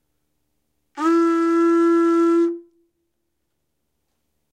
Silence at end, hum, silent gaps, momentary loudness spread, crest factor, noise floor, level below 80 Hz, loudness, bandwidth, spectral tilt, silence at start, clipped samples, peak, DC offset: 1.9 s; none; none; 8 LU; 14 dB; -76 dBFS; -82 dBFS; -18 LUFS; 8.8 kHz; -4 dB/octave; 0.95 s; under 0.1%; -8 dBFS; under 0.1%